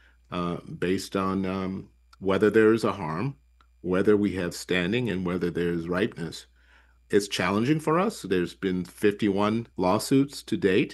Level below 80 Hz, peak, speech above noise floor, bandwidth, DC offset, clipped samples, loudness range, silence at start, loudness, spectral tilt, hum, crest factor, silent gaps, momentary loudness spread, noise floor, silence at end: -58 dBFS; -8 dBFS; 33 dB; 12.5 kHz; under 0.1%; under 0.1%; 2 LU; 0.3 s; -26 LUFS; -6 dB/octave; none; 18 dB; none; 10 LU; -58 dBFS; 0 s